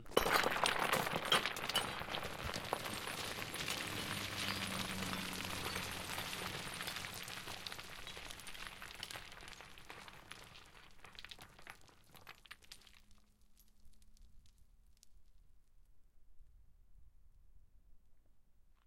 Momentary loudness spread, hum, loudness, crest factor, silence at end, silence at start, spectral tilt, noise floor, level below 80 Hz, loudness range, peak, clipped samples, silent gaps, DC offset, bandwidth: 22 LU; none; -40 LUFS; 28 dB; 0.15 s; 0 s; -2.5 dB/octave; -65 dBFS; -62 dBFS; 21 LU; -16 dBFS; under 0.1%; none; under 0.1%; 16.5 kHz